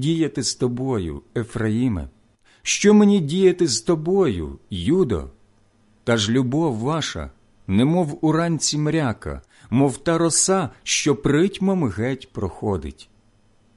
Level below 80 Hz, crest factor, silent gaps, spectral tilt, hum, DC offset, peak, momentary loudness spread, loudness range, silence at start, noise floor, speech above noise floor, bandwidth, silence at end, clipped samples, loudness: -42 dBFS; 16 dB; none; -5 dB/octave; none; under 0.1%; -4 dBFS; 13 LU; 4 LU; 0 s; -58 dBFS; 37 dB; 11.5 kHz; 0.75 s; under 0.1%; -21 LUFS